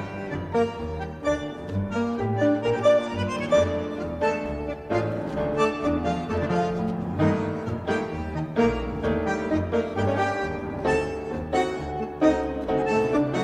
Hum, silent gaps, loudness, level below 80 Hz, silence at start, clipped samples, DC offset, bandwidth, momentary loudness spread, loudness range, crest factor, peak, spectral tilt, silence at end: none; none; -26 LUFS; -42 dBFS; 0 s; under 0.1%; under 0.1%; 11 kHz; 8 LU; 2 LU; 18 dB; -8 dBFS; -7 dB/octave; 0 s